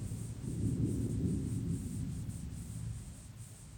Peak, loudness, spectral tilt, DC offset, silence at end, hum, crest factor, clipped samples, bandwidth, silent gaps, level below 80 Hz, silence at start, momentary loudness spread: -22 dBFS; -39 LUFS; -7.5 dB/octave; under 0.1%; 0 s; none; 16 dB; under 0.1%; 19 kHz; none; -48 dBFS; 0 s; 14 LU